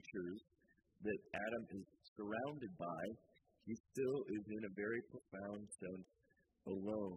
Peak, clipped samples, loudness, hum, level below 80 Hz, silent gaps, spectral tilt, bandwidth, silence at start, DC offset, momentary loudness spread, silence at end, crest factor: -30 dBFS; under 0.1%; -47 LUFS; none; -78 dBFS; 2.08-2.16 s, 3.80-3.84 s; -6.5 dB/octave; 10.5 kHz; 0.05 s; under 0.1%; 12 LU; 0 s; 18 dB